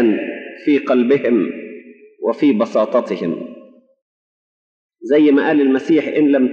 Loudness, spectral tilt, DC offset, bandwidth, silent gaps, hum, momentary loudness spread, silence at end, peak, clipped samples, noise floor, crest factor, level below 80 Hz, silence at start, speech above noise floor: -16 LUFS; -7.5 dB/octave; under 0.1%; 7 kHz; 4.02-4.89 s; none; 14 LU; 0 s; -4 dBFS; under 0.1%; -42 dBFS; 12 dB; -74 dBFS; 0 s; 28 dB